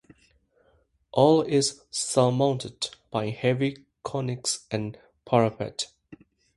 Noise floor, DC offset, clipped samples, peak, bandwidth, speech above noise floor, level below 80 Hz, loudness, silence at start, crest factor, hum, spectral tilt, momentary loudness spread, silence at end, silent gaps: -66 dBFS; under 0.1%; under 0.1%; -6 dBFS; 11.5 kHz; 41 dB; -62 dBFS; -26 LUFS; 1.15 s; 22 dB; none; -5 dB/octave; 13 LU; 0.4 s; none